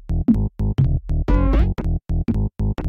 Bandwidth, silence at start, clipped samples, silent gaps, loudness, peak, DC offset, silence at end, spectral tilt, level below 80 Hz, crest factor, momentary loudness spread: 5.2 kHz; 0.05 s; under 0.1%; none; -21 LUFS; -6 dBFS; under 0.1%; 0 s; -10 dB/octave; -22 dBFS; 14 dB; 5 LU